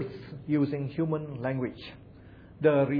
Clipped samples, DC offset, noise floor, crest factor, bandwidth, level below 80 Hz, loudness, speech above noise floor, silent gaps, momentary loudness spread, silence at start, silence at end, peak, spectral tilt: under 0.1%; under 0.1%; -50 dBFS; 20 dB; 5.2 kHz; -60 dBFS; -30 LUFS; 22 dB; none; 18 LU; 0 s; 0 s; -10 dBFS; -10.5 dB/octave